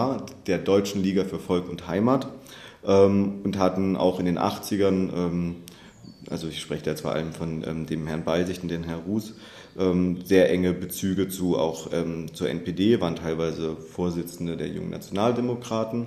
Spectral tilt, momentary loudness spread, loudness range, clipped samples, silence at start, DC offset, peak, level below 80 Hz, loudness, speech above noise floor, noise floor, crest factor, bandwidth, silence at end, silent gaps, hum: -6.5 dB/octave; 10 LU; 6 LU; under 0.1%; 0 s; under 0.1%; -4 dBFS; -54 dBFS; -26 LUFS; 22 dB; -47 dBFS; 20 dB; 14 kHz; 0 s; none; none